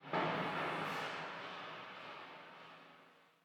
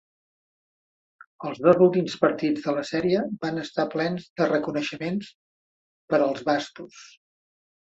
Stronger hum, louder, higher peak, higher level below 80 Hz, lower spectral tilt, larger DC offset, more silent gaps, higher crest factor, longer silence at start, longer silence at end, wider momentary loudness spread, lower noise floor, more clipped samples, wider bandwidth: neither; second, -42 LUFS vs -24 LUFS; second, -24 dBFS vs -4 dBFS; second, -84 dBFS vs -68 dBFS; second, -5 dB/octave vs -6.5 dB/octave; neither; second, none vs 4.30-4.36 s, 5.35-6.08 s; about the same, 20 dB vs 22 dB; second, 0 s vs 1.4 s; second, 0.2 s vs 0.9 s; first, 19 LU vs 15 LU; second, -65 dBFS vs under -90 dBFS; neither; first, 18.5 kHz vs 8 kHz